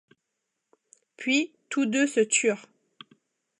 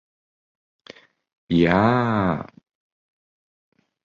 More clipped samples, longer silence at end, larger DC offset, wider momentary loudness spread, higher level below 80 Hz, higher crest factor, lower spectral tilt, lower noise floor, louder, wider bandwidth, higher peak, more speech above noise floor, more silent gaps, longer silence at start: neither; second, 1 s vs 1.6 s; neither; about the same, 10 LU vs 12 LU; second, -84 dBFS vs -50 dBFS; about the same, 18 dB vs 20 dB; second, -2.5 dB/octave vs -8.5 dB/octave; first, -82 dBFS vs -48 dBFS; second, -25 LUFS vs -20 LUFS; first, 11 kHz vs 7.4 kHz; second, -10 dBFS vs -4 dBFS; first, 57 dB vs 29 dB; neither; second, 1.2 s vs 1.5 s